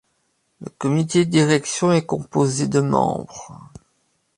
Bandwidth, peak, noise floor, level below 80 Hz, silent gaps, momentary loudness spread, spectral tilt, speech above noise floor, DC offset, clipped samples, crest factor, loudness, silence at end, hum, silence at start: 11.5 kHz; -2 dBFS; -68 dBFS; -56 dBFS; none; 20 LU; -5.5 dB/octave; 49 dB; under 0.1%; under 0.1%; 18 dB; -20 LUFS; 0.8 s; none; 0.6 s